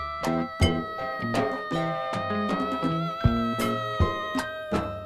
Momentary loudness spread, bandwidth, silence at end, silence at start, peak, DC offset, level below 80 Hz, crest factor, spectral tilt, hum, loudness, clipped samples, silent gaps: 5 LU; 15.5 kHz; 0 s; 0 s; -8 dBFS; under 0.1%; -40 dBFS; 18 dB; -6 dB/octave; none; -27 LUFS; under 0.1%; none